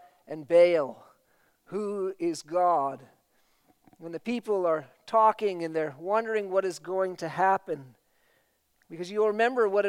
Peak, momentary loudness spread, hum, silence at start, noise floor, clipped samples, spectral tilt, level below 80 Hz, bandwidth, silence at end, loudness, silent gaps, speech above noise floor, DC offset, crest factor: -10 dBFS; 15 LU; none; 0.3 s; -70 dBFS; under 0.1%; -5.5 dB/octave; -82 dBFS; 12.5 kHz; 0 s; -27 LUFS; none; 43 dB; under 0.1%; 18 dB